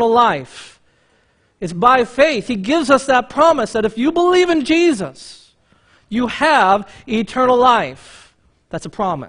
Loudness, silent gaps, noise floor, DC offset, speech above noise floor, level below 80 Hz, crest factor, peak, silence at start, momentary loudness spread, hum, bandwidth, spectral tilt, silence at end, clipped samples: -15 LUFS; none; -58 dBFS; under 0.1%; 43 dB; -50 dBFS; 16 dB; 0 dBFS; 0 s; 14 LU; none; 10.5 kHz; -4.5 dB/octave; 0 s; under 0.1%